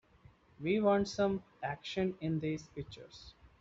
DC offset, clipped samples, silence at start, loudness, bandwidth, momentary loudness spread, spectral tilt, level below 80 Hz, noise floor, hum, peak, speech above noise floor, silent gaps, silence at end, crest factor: under 0.1%; under 0.1%; 0.6 s; -35 LUFS; 7.8 kHz; 19 LU; -5.5 dB/octave; -62 dBFS; -63 dBFS; none; -16 dBFS; 28 dB; none; 0.15 s; 20 dB